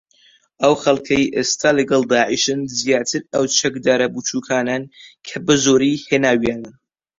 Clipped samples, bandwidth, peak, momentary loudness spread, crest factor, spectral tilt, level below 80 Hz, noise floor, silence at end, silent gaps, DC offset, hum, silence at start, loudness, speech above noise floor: under 0.1%; 7.8 kHz; -2 dBFS; 8 LU; 16 dB; -3.5 dB/octave; -54 dBFS; -55 dBFS; 0.45 s; none; under 0.1%; none; 0.6 s; -17 LUFS; 37 dB